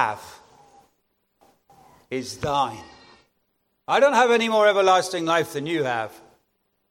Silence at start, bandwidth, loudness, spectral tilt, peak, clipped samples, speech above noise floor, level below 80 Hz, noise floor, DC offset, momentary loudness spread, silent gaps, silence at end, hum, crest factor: 0 s; 16.5 kHz; -21 LUFS; -4 dB/octave; -4 dBFS; under 0.1%; 51 dB; -62 dBFS; -72 dBFS; under 0.1%; 17 LU; none; 0.8 s; none; 20 dB